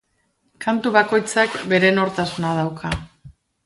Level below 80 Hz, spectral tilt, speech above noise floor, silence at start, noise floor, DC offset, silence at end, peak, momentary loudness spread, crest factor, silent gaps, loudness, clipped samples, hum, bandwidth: -46 dBFS; -5 dB/octave; 48 dB; 0.6 s; -67 dBFS; under 0.1%; 0.35 s; 0 dBFS; 11 LU; 20 dB; none; -20 LUFS; under 0.1%; none; 11.5 kHz